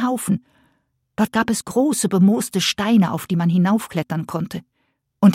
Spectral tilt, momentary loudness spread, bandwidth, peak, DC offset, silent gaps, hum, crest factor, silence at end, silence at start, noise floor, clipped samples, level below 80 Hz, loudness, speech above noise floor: -5.5 dB/octave; 10 LU; 16.5 kHz; -2 dBFS; under 0.1%; none; none; 16 dB; 0 s; 0 s; -70 dBFS; under 0.1%; -58 dBFS; -19 LUFS; 51 dB